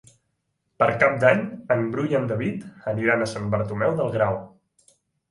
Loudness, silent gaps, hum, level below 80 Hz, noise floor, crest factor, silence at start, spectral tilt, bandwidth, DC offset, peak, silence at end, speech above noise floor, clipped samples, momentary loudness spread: -23 LUFS; none; none; -56 dBFS; -75 dBFS; 22 dB; 0.8 s; -7 dB/octave; 11.5 kHz; under 0.1%; -2 dBFS; 0.85 s; 52 dB; under 0.1%; 9 LU